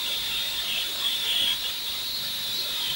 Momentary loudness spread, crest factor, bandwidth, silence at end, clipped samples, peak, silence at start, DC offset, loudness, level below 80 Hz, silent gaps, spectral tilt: 5 LU; 14 dB; 16.5 kHz; 0 s; under 0.1%; -14 dBFS; 0 s; under 0.1%; -25 LUFS; -56 dBFS; none; 0.5 dB/octave